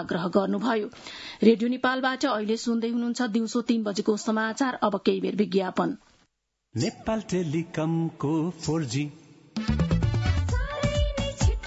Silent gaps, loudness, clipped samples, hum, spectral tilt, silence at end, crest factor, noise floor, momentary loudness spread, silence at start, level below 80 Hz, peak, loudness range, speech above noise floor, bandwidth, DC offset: none; -26 LUFS; under 0.1%; none; -6 dB/octave; 0 s; 20 dB; -74 dBFS; 6 LU; 0 s; -38 dBFS; -6 dBFS; 4 LU; 48 dB; 8 kHz; under 0.1%